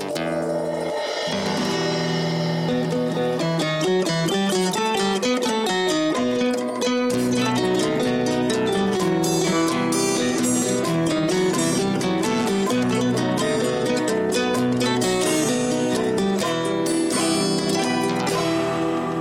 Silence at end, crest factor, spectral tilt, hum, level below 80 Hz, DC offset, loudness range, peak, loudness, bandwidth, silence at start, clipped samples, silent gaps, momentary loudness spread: 0 s; 12 dB; -4.5 dB/octave; none; -54 dBFS; under 0.1%; 1 LU; -8 dBFS; -21 LUFS; 16.5 kHz; 0 s; under 0.1%; none; 3 LU